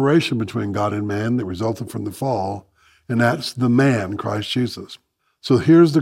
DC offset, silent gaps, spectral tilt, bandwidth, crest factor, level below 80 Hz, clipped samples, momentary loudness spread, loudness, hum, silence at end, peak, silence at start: under 0.1%; none; -6.5 dB/octave; 15 kHz; 16 dB; -58 dBFS; under 0.1%; 13 LU; -20 LUFS; none; 0 s; -2 dBFS; 0 s